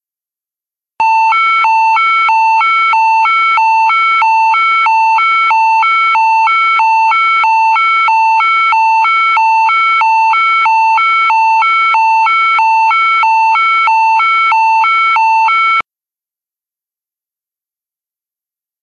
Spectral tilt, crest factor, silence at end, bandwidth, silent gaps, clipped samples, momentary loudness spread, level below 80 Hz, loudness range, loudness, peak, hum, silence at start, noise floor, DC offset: 2.5 dB/octave; 8 dB; 3 s; 8.4 kHz; none; under 0.1%; 0 LU; -68 dBFS; 3 LU; -8 LUFS; -2 dBFS; none; 1 s; -90 dBFS; under 0.1%